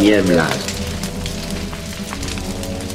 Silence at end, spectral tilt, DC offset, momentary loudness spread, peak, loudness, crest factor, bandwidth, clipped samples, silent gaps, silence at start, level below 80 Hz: 0 s; -4.5 dB/octave; under 0.1%; 12 LU; -2 dBFS; -21 LUFS; 18 dB; 16 kHz; under 0.1%; none; 0 s; -32 dBFS